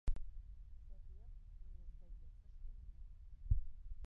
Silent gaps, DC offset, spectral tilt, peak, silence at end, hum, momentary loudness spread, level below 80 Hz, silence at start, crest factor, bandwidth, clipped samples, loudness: none; under 0.1%; -9 dB/octave; -22 dBFS; 0 s; none; 17 LU; -46 dBFS; 0.05 s; 20 dB; 2.5 kHz; under 0.1%; -52 LUFS